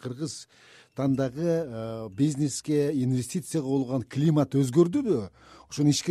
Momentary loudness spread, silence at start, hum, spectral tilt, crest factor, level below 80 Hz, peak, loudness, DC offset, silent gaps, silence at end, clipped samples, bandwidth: 12 LU; 0.05 s; none; -6.5 dB/octave; 18 dB; -62 dBFS; -8 dBFS; -27 LUFS; under 0.1%; none; 0 s; under 0.1%; 14.5 kHz